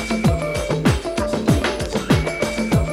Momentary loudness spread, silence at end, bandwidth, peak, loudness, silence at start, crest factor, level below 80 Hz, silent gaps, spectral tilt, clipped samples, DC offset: 4 LU; 0 s; 16 kHz; -2 dBFS; -20 LUFS; 0 s; 18 dB; -30 dBFS; none; -6 dB/octave; under 0.1%; under 0.1%